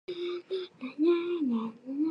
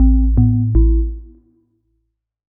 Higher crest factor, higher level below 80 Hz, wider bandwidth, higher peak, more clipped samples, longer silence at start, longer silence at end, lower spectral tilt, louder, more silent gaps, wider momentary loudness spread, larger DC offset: about the same, 16 dB vs 14 dB; second, -86 dBFS vs -18 dBFS; first, 5.8 kHz vs 1.1 kHz; second, -16 dBFS vs -2 dBFS; neither; about the same, 0.1 s vs 0 s; second, 0 s vs 1.25 s; second, -7 dB/octave vs -17 dB/octave; second, -32 LUFS vs -16 LUFS; neither; about the same, 10 LU vs 12 LU; neither